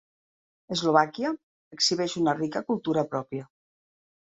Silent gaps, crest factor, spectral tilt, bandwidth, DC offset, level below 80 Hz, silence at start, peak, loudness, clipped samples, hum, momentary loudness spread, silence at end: 1.43-1.71 s; 24 dB; -4 dB/octave; 8.4 kHz; under 0.1%; -70 dBFS; 0.7 s; -6 dBFS; -26 LUFS; under 0.1%; none; 11 LU; 0.85 s